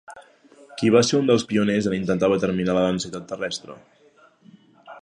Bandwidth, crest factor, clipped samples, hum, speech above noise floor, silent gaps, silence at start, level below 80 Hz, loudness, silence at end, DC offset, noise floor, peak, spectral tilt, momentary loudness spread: 10.5 kHz; 20 dB; under 0.1%; none; 34 dB; none; 0.1 s; -56 dBFS; -22 LUFS; 0.05 s; under 0.1%; -55 dBFS; -4 dBFS; -5.5 dB/octave; 12 LU